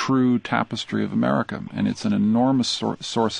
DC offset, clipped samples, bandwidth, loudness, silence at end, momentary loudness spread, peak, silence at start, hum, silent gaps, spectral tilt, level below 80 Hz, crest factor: under 0.1%; under 0.1%; 10 kHz; -22 LUFS; 0 s; 6 LU; -4 dBFS; 0 s; none; none; -5.5 dB/octave; -56 dBFS; 18 dB